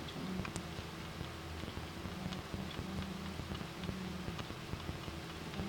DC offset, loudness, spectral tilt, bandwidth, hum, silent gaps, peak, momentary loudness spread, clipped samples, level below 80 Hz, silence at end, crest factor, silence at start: under 0.1%; -44 LUFS; -5 dB/octave; 19 kHz; none; none; -18 dBFS; 3 LU; under 0.1%; -54 dBFS; 0 s; 24 dB; 0 s